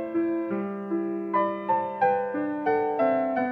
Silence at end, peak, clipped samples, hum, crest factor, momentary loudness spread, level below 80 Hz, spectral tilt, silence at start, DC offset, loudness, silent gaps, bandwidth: 0 s; -12 dBFS; under 0.1%; none; 14 dB; 6 LU; -74 dBFS; -9 dB/octave; 0 s; under 0.1%; -26 LUFS; none; 4.9 kHz